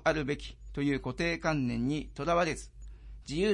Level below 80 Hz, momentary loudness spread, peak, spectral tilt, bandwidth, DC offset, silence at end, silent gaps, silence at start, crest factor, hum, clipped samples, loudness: -48 dBFS; 19 LU; -14 dBFS; -5.5 dB/octave; 11.5 kHz; under 0.1%; 0 s; none; 0 s; 18 dB; none; under 0.1%; -32 LUFS